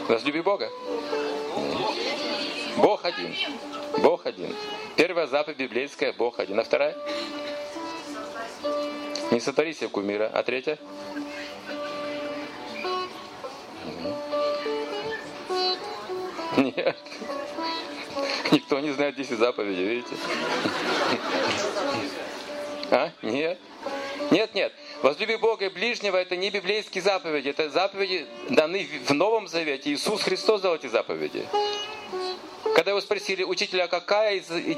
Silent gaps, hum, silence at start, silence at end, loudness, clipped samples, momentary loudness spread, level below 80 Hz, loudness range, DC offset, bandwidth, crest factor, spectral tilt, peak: none; none; 0 s; 0 s; -27 LUFS; under 0.1%; 11 LU; -70 dBFS; 5 LU; under 0.1%; 15.5 kHz; 24 dB; -3.5 dB/octave; -4 dBFS